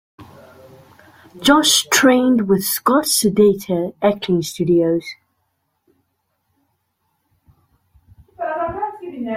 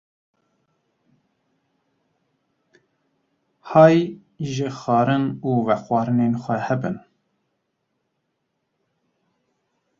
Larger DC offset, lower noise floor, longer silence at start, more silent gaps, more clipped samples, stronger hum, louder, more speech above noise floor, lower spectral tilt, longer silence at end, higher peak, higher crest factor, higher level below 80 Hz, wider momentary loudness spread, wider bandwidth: neither; second, -70 dBFS vs -75 dBFS; second, 0.2 s vs 3.65 s; neither; neither; neither; first, -16 LUFS vs -20 LUFS; about the same, 54 dB vs 56 dB; second, -3.5 dB/octave vs -7.5 dB/octave; second, 0 s vs 3 s; about the same, -2 dBFS vs -2 dBFS; about the same, 18 dB vs 22 dB; first, -54 dBFS vs -64 dBFS; about the same, 14 LU vs 15 LU; first, 16.5 kHz vs 7.4 kHz